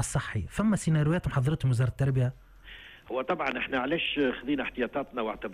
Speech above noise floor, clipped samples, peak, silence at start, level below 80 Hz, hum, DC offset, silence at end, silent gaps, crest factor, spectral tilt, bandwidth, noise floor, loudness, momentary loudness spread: 20 dB; under 0.1%; -16 dBFS; 0 s; -48 dBFS; none; under 0.1%; 0 s; none; 14 dB; -6 dB/octave; 13.5 kHz; -49 dBFS; -29 LUFS; 9 LU